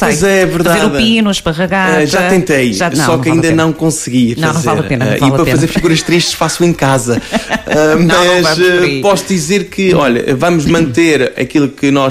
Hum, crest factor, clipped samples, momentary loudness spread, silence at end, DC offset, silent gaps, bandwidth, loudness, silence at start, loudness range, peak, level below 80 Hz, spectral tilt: none; 10 dB; under 0.1%; 4 LU; 0 s; under 0.1%; none; 16 kHz; -10 LUFS; 0 s; 1 LU; 0 dBFS; -36 dBFS; -5 dB/octave